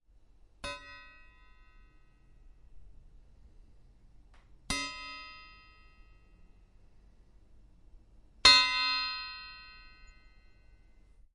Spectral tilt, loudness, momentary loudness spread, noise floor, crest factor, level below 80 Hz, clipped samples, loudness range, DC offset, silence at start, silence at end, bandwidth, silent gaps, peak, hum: 0 dB/octave; -26 LUFS; 30 LU; -60 dBFS; 30 dB; -56 dBFS; under 0.1%; 22 LU; under 0.1%; 0.65 s; 1.7 s; 11.5 kHz; none; -6 dBFS; none